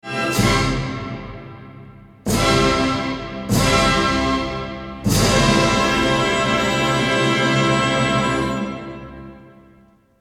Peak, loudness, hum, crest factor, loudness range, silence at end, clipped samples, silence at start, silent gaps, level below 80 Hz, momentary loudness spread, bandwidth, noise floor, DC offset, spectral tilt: -4 dBFS; -18 LUFS; none; 16 dB; 4 LU; 0.75 s; under 0.1%; 0.05 s; none; -34 dBFS; 16 LU; 17.5 kHz; -52 dBFS; under 0.1%; -4.5 dB/octave